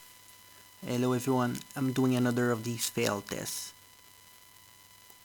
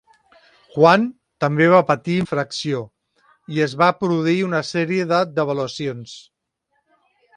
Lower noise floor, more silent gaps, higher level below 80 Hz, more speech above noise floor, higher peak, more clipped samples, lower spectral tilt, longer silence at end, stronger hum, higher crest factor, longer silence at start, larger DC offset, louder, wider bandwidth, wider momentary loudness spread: second, -56 dBFS vs -71 dBFS; neither; second, -70 dBFS vs -62 dBFS; second, 26 dB vs 53 dB; second, -14 dBFS vs 0 dBFS; neither; about the same, -5 dB/octave vs -6 dB/octave; first, 1.5 s vs 1.15 s; neither; about the same, 18 dB vs 20 dB; second, 0 s vs 0.75 s; neither; second, -31 LUFS vs -19 LUFS; first, 19 kHz vs 11 kHz; first, 24 LU vs 14 LU